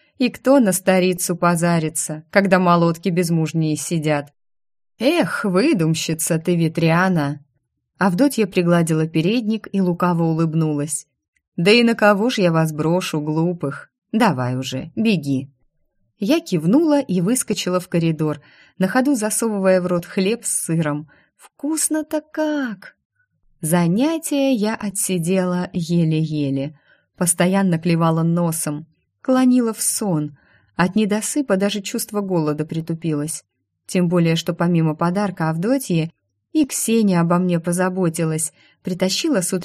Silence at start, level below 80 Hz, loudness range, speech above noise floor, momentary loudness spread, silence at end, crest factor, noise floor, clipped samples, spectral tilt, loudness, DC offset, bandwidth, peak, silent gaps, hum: 0.2 s; -60 dBFS; 4 LU; 52 dB; 9 LU; 0 s; 18 dB; -70 dBFS; under 0.1%; -5 dB/octave; -19 LUFS; under 0.1%; 15.5 kHz; -2 dBFS; 11.28-11.33 s, 11.48-11.52 s, 13.98-14.02 s, 23.05-23.10 s; none